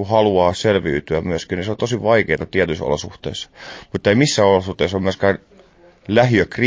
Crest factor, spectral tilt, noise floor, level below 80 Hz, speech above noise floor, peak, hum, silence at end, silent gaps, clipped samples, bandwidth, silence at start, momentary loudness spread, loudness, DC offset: 16 dB; -5.5 dB/octave; -49 dBFS; -40 dBFS; 31 dB; -2 dBFS; none; 0 s; none; under 0.1%; 8 kHz; 0 s; 14 LU; -18 LUFS; under 0.1%